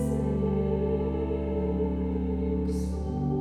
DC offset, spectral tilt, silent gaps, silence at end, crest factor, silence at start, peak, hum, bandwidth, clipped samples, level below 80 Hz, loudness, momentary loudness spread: under 0.1%; -9 dB/octave; none; 0 s; 14 dB; 0 s; -14 dBFS; none; 11 kHz; under 0.1%; -34 dBFS; -29 LUFS; 3 LU